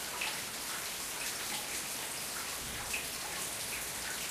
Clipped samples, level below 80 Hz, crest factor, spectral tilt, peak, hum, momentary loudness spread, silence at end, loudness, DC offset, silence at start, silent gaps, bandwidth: under 0.1%; -62 dBFS; 16 dB; -0.5 dB/octave; -22 dBFS; none; 2 LU; 0 s; -36 LUFS; under 0.1%; 0 s; none; 15.5 kHz